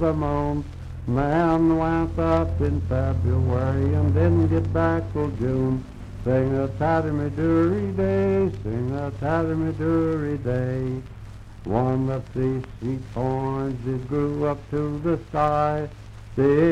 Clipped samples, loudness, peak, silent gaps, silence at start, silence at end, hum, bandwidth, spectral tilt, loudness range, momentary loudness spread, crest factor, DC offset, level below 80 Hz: under 0.1%; -24 LUFS; -6 dBFS; none; 0 s; 0 s; none; 8.6 kHz; -9.5 dB/octave; 4 LU; 9 LU; 16 dB; under 0.1%; -38 dBFS